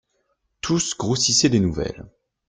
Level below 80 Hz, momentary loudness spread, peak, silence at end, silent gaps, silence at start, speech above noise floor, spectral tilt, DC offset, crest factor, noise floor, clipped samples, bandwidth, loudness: -46 dBFS; 15 LU; -4 dBFS; 0.4 s; none; 0.65 s; 50 dB; -3.5 dB/octave; under 0.1%; 18 dB; -71 dBFS; under 0.1%; 11 kHz; -20 LUFS